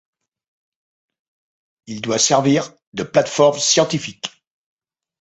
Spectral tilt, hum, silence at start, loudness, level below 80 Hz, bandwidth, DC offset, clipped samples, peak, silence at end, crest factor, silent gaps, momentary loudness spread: -3.5 dB/octave; none; 1.9 s; -16 LUFS; -62 dBFS; 8.4 kHz; under 0.1%; under 0.1%; -2 dBFS; 0.95 s; 20 dB; 2.87-2.92 s; 16 LU